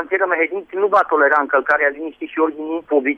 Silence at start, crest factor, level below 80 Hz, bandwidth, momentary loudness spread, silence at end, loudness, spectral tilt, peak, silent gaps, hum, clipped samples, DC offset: 0 s; 14 dB; -62 dBFS; 6.4 kHz; 8 LU; 0 s; -17 LUFS; -5.5 dB/octave; -4 dBFS; none; none; under 0.1%; under 0.1%